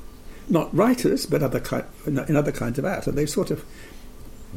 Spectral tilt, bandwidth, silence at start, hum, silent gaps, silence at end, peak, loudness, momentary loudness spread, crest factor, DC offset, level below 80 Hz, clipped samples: -6 dB/octave; 16.5 kHz; 0 s; none; none; 0 s; -8 dBFS; -24 LUFS; 15 LU; 16 dB; under 0.1%; -40 dBFS; under 0.1%